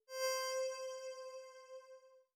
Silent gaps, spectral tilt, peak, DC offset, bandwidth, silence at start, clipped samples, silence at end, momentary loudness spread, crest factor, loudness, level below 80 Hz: none; 6 dB/octave; -28 dBFS; under 0.1%; over 20 kHz; 0.1 s; under 0.1%; 0.15 s; 18 LU; 16 dB; -42 LUFS; under -90 dBFS